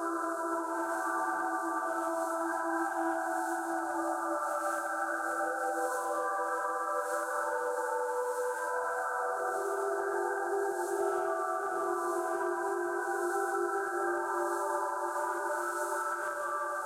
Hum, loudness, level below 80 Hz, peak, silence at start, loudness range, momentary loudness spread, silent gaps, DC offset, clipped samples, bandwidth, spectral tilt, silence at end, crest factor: none; -33 LUFS; -82 dBFS; -20 dBFS; 0 s; 0 LU; 2 LU; none; under 0.1%; under 0.1%; 16.5 kHz; -2 dB/octave; 0 s; 14 dB